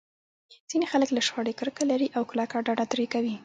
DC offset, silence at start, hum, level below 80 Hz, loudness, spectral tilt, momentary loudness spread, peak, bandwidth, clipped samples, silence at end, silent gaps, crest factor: under 0.1%; 0.5 s; none; -74 dBFS; -27 LUFS; -3.5 dB/octave; 5 LU; -12 dBFS; 9.4 kHz; under 0.1%; 0 s; 0.60-0.68 s; 16 dB